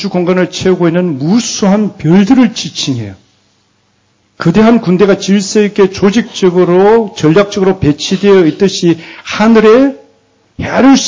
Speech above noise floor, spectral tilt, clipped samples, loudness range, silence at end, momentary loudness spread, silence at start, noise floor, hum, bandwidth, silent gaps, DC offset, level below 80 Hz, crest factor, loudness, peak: 46 dB; -5.5 dB/octave; under 0.1%; 3 LU; 0 s; 9 LU; 0 s; -54 dBFS; none; 7.6 kHz; none; under 0.1%; -40 dBFS; 10 dB; -9 LUFS; 0 dBFS